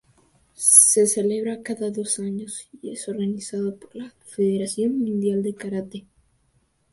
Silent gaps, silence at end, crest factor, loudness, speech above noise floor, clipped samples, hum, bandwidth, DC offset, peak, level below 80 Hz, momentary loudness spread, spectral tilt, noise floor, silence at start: none; 0.95 s; 24 dB; -20 LUFS; 43 dB; under 0.1%; none; 12 kHz; under 0.1%; 0 dBFS; -66 dBFS; 23 LU; -4 dB/octave; -66 dBFS; 0.6 s